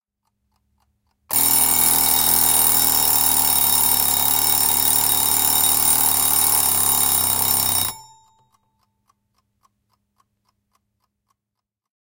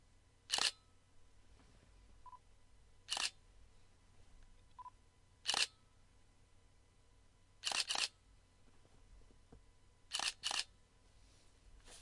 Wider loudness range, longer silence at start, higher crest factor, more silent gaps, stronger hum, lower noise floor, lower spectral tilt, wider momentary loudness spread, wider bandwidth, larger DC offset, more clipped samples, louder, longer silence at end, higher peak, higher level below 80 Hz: about the same, 7 LU vs 6 LU; first, 1.3 s vs 0.5 s; second, 20 dB vs 30 dB; neither; neither; first, -83 dBFS vs -68 dBFS; about the same, 0 dB/octave vs 1 dB/octave; second, 3 LU vs 23 LU; first, 18 kHz vs 11.5 kHz; neither; neither; first, -14 LUFS vs -39 LUFS; first, 4.1 s vs 0 s; first, 0 dBFS vs -18 dBFS; first, -48 dBFS vs -68 dBFS